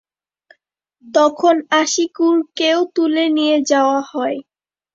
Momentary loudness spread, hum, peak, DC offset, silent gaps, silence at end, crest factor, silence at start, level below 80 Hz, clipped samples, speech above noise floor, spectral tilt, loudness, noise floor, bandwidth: 7 LU; none; -2 dBFS; under 0.1%; none; 0.55 s; 16 dB; 1.05 s; -68 dBFS; under 0.1%; 49 dB; -1.5 dB/octave; -16 LUFS; -65 dBFS; 7.8 kHz